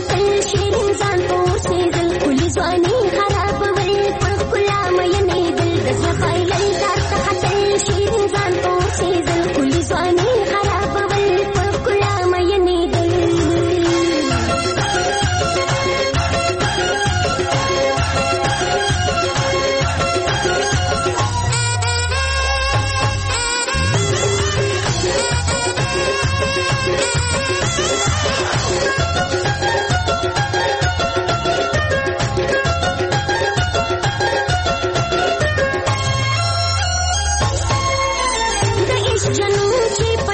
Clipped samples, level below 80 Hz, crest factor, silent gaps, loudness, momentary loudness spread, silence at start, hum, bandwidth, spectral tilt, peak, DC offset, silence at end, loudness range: under 0.1%; -30 dBFS; 12 dB; none; -17 LUFS; 2 LU; 0 s; none; 8.8 kHz; -4 dB/octave; -4 dBFS; under 0.1%; 0 s; 1 LU